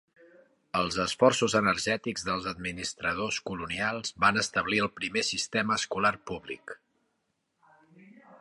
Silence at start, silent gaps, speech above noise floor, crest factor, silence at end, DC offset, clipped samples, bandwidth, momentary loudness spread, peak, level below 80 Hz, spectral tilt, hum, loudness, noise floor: 0.75 s; none; 49 dB; 22 dB; 0.05 s; under 0.1%; under 0.1%; 11.5 kHz; 13 LU; -8 dBFS; -58 dBFS; -3 dB/octave; none; -28 LUFS; -78 dBFS